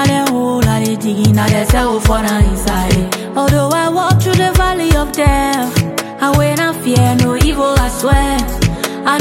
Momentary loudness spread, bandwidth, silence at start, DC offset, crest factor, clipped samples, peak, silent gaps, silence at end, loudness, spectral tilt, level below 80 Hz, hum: 4 LU; 17 kHz; 0 s; under 0.1%; 12 dB; under 0.1%; 0 dBFS; none; 0 s; -13 LUFS; -5.5 dB/octave; -20 dBFS; none